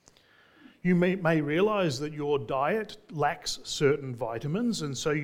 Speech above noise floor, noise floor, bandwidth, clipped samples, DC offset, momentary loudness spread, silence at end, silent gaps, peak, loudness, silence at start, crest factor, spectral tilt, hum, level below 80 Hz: 32 dB; -60 dBFS; 16 kHz; under 0.1%; under 0.1%; 8 LU; 0 s; none; -12 dBFS; -28 LUFS; 0.85 s; 18 dB; -5.5 dB/octave; none; -58 dBFS